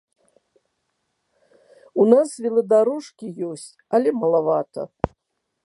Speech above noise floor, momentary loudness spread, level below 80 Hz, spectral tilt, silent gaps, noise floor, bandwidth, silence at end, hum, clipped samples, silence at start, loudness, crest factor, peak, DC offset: 57 dB; 15 LU; -52 dBFS; -6.5 dB/octave; none; -77 dBFS; 11.5 kHz; 0.55 s; none; under 0.1%; 1.95 s; -21 LUFS; 22 dB; -2 dBFS; under 0.1%